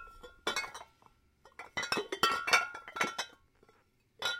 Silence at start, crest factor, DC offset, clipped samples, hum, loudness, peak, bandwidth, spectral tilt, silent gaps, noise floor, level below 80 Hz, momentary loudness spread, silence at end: 0 s; 26 dB; under 0.1%; under 0.1%; none; -33 LUFS; -10 dBFS; 16.5 kHz; -1 dB/octave; none; -69 dBFS; -68 dBFS; 17 LU; 0 s